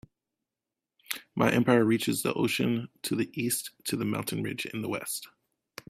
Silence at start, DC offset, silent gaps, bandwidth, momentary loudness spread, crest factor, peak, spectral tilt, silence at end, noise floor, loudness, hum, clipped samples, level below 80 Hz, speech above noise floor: 1.1 s; under 0.1%; none; 16 kHz; 12 LU; 24 dB; -8 dBFS; -4.5 dB/octave; 0.6 s; -89 dBFS; -29 LUFS; none; under 0.1%; -66 dBFS; 61 dB